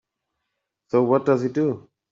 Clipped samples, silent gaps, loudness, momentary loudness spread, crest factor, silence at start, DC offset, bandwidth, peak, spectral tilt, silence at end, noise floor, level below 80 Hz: under 0.1%; none; -22 LUFS; 6 LU; 18 dB; 0.95 s; under 0.1%; 7.4 kHz; -6 dBFS; -9 dB/octave; 0.3 s; -80 dBFS; -68 dBFS